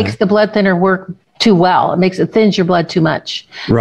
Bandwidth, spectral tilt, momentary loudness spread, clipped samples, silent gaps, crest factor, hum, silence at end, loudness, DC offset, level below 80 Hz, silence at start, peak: 9.8 kHz; -6.5 dB/octave; 9 LU; under 0.1%; none; 12 dB; none; 0 s; -13 LUFS; 0.2%; -44 dBFS; 0 s; 0 dBFS